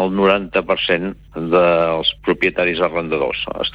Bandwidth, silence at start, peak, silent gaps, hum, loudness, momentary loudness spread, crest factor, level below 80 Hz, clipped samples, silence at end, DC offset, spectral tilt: 5.4 kHz; 0 s; -2 dBFS; none; none; -17 LUFS; 6 LU; 16 dB; -44 dBFS; under 0.1%; 0 s; under 0.1%; -7 dB/octave